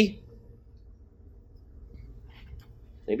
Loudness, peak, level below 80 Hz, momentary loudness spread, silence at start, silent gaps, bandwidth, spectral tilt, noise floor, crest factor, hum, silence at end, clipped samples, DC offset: -37 LUFS; -6 dBFS; -50 dBFS; 17 LU; 0 s; none; 8.4 kHz; -6.5 dB/octave; -52 dBFS; 28 dB; none; 0 s; under 0.1%; under 0.1%